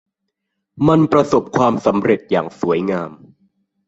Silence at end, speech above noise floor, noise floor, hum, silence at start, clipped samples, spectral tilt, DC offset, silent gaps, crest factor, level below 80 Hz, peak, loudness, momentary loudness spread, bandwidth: 0.75 s; 60 dB; -76 dBFS; none; 0.75 s; under 0.1%; -7.5 dB/octave; under 0.1%; none; 16 dB; -50 dBFS; -2 dBFS; -16 LUFS; 8 LU; 8 kHz